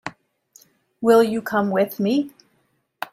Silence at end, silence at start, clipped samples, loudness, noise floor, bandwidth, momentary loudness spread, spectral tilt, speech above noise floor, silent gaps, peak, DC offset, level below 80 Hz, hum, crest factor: 0.05 s; 0.05 s; under 0.1%; -20 LUFS; -67 dBFS; 16 kHz; 18 LU; -6 dB/octave; 48 dB; none; -4 dBFS; under 0.1%; -66 dBFS; none; 18 dB